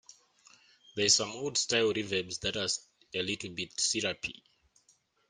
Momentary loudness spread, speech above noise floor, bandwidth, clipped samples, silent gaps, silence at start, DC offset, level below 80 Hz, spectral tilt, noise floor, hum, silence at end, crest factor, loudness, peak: 12 LU; 38 dB; 11 kHz; under 0.1%; none; 0.95 s; under 0.1%; -66 dBFS; -1.5 dB/octave; -70 dBFS; none; 0.95 s; 22 dB; -30 LUFS; -12 dBFS